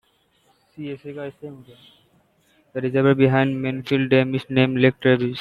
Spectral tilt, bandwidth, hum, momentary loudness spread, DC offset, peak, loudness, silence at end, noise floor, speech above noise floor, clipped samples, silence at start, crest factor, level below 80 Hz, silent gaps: -8.5 dB/octave; 5.6 kHz; none; 17 LU; under 0.1%; -2 dBFS; -19 LUFS; 0 s; -62 dBFS; 42 dB; under 0.1%; 0.8 s; 20 dB; -60 dBFS; none